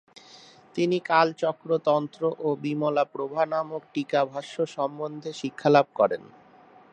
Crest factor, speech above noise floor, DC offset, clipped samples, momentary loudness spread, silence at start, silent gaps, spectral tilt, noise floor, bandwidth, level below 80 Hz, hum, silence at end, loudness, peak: 22 dB; 28 dB; under 0.1%; under 0.1%; 12 LU; 0.75 s; none; -6 dB/octave; -53 dBFS; 9.4 kHz; -78 dBFS; none; 0.65 s; -26 LUFS; -4 dBFS